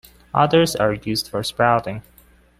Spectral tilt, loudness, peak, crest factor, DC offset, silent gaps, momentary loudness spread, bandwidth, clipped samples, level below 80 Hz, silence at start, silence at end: -5 dB/octave; -19 LUFS; -2 dBFS; 18 dB; under 0.1%; none; 10 LU; 16 kHz; under 0.1%; -48 dBFS; 0.35 s; 0.6 s